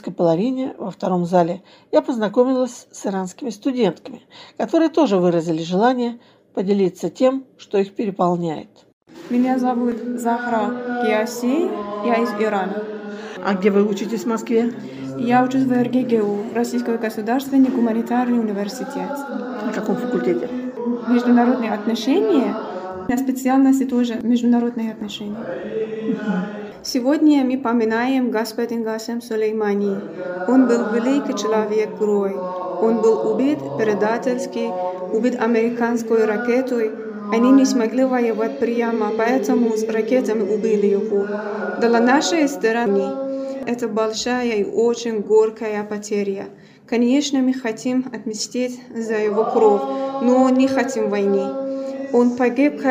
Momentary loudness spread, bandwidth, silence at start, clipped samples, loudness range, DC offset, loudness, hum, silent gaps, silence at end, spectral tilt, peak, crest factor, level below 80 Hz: 10 LU; 16 kHz; 0.05 s; under 0.1%; 3 LU; under 0.1%; -20 LUFS; none; 8.93-9.01 s; 0 s; -5.5 dB/octave; -2 dBFS; 16 dB; -66 dBFS